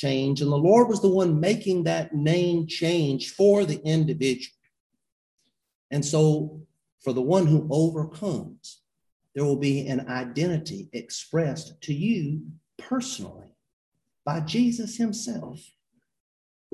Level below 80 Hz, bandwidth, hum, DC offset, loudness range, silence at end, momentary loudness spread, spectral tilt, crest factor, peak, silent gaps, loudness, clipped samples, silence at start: -62 dBFS; 12 kHz; none; under 0.1%; 8 LU; 1.15 s; 15 LU; -6.5 dB/octave; 18 dB; -6 dBFS; 4.80-4.90 s, 5.12-5.37 s, 5.75-5.90 s, 6.92-6.98 s, 9.12-9.20 s, 13.73-13.92 s; -25 LUFS; under 0.1%; 0 s